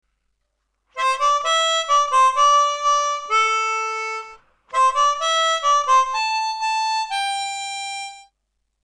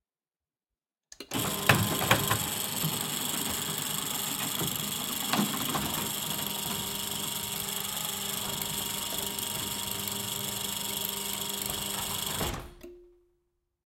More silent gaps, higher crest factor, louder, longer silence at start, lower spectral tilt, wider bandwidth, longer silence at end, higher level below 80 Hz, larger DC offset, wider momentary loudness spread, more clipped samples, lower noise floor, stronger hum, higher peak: neither; second, 14 dB vs 28 dB; first, -19 LUFS vs -30 LUFS; second, 0.95 s vs 1.2 s; second, 4 dB/octave vs -2.5 dB/octave; second, 11 kHz vs 17 kHz; second, 0.65 s vs 0.95 s; second, -62 dBFS vs -56 dBFS; neither; first, 11 LU vs 6 LU; neither; second, -74 dBFS vs under -90 dBFS; neither; about the same, -6 dBFS vs -4 dBFS